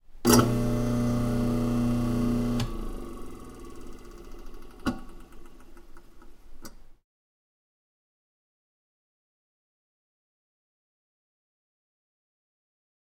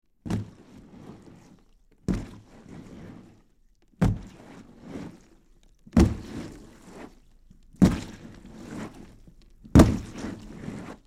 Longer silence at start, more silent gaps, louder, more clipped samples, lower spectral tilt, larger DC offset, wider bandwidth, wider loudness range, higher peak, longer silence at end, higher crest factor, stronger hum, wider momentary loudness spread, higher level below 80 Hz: second, 0.1 s vs 0.25 s; neither; about the same, -27 LUFS vs -26 LUFS; neither; second, -5.5 dB/octave vs -7.5 dB/octave; neither; about the same, 17 kHz vs 15.5 kHz; first, 16 LU vs 12 LU; about the same, -4 dBFS vs -2 dBFS; first, 6.1 s vs 0.15 s; about the same, 26 dB vs 26 dB; neither; about the same, 27 LU vs 26 LU; about the same, -40 dBFS vs -38 dBFS